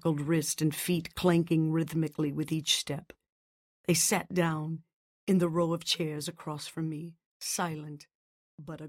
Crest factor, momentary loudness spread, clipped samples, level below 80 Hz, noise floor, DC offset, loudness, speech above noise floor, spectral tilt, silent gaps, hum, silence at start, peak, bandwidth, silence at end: 18 dB; 15 LU; under 0.1%; -64 dBFS; under -90 dBFS; under 0.1%; -30 LUFS; over 60 dB; -4.5 dB/octave; 3.32-3.84 s, 4.93-5.27 s, 7.26-7.40 s, 8.15-8.58 s; none; 0.05 s; -12 dBFS; 16.5 kHz; 0 s